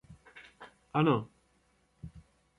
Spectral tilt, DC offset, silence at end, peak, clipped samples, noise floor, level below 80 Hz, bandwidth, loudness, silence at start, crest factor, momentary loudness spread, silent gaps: -8.5 dB/octave; under 0.1%; 0.4 s; -14 dBFS; under 0.1%; -71 dBFS; -64 dBFS; 11 kHz; -30 LUFS; 0.1 s; 22 dB; 25 LU; none